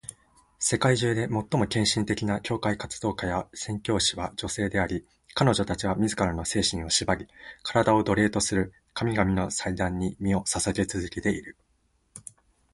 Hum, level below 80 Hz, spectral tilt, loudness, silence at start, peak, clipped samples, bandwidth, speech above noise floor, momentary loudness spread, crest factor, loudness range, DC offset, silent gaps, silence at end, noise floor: none; -46 dBFS; -4 dB/octave; -27 LUFS; 0.05 s; -6 dBFS; under 0.1%; 11.5 kHz; 42 dB; 10 LU; 22 dB; 3 LU; under 0.1%; none; 0.55 s; -69 dBFS